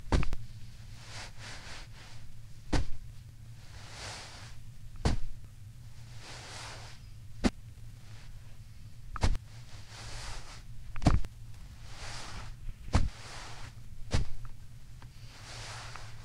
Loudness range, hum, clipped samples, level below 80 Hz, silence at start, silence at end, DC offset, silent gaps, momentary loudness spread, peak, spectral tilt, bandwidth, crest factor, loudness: 6 LU; none; under 0.1%; -40 dBFS; 0 s; 0 s; under 0.1%; none; 18 LU; -10 dBFS; -5 dB/octave; 12 kHz; 24 dB; -39 LUFS